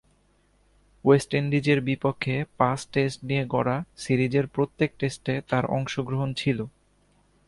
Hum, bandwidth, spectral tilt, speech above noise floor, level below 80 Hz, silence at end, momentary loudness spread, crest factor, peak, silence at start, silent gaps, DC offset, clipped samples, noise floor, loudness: 50 Hz at -55 dBFS; 11.5 kHz; -6.5 dB/octave; 39 dB; -56 dBFS; 0.8 s; 7 LU; 20 dB; -6 dBFS; 1.05 s; none; under 0.1%; under 0.1%; -64 dBFS; -26 LUFS